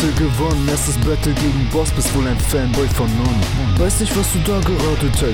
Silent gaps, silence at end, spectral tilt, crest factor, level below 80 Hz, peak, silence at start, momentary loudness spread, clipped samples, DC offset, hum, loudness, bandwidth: none; 0 s; -5 dB/octave; 12 dB; -22 dBFS; -4 dBFS; 0 s; 1 LU; under 0.1%; 0.5%; none; -17 LUFS; 19.5 kHz